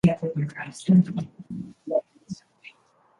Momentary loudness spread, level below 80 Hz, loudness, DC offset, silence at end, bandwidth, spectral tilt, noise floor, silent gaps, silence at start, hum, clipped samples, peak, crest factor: 21 LU; -56 dBFS; -25 LUFS; under 0.1%; 0.5 s; 11 kHz; -8 dB/octave; -61 dBFS; none; 0.05 s; none; under 0.1%; -8 dBFS; 18 dB